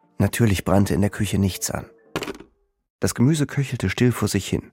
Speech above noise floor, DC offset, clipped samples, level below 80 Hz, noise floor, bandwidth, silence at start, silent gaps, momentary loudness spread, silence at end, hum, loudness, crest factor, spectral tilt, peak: 30 dB; under 0.1%; under 0.1%; -44 dBFS; -51 dBFS; 16.5 kHz; 0.2 s; 2.90-2.99 s; 11 LU; 0.05 s; none; -22 LUFS; 18 dB; -5.5 dB/octave; -4 dBFS